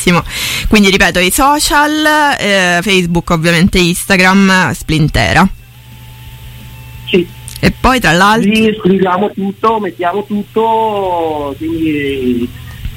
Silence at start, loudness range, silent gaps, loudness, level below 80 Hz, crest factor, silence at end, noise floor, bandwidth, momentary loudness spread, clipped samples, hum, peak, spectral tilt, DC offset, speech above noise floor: 0 s; 5 LU; none; -10 LUFS; -28 dBFS; 12 dB; 0 s; -34 dBFS; 17 kHz; 9 LU; under 0.1%; none; 0 dBFS; -4.5 dB/octave; under 0.1%; 24 dB